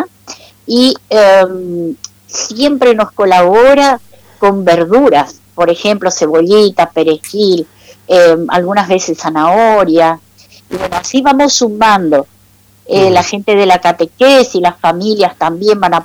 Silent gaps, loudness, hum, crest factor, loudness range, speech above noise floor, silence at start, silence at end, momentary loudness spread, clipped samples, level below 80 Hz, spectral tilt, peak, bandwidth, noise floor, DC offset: none; -10 LUFS; none; 8 dB; 2 LU; 37 dB; 0 s; 0 s; 11 LU; under 0.1%; -46 dBFS; -4 dB/octave; -2 dBFS; 17 kHz; -46 dBFS; under 0.1%